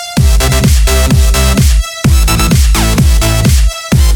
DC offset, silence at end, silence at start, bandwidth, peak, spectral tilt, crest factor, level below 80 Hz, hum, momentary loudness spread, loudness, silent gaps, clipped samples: under 0.1%; 0 s; 0 s; over 20 kHz; 0 dBFS; -4.5 dB/octave; 8 dB; -10 dBFS; none; 2 LU; -9 LUFS; none; 0.3%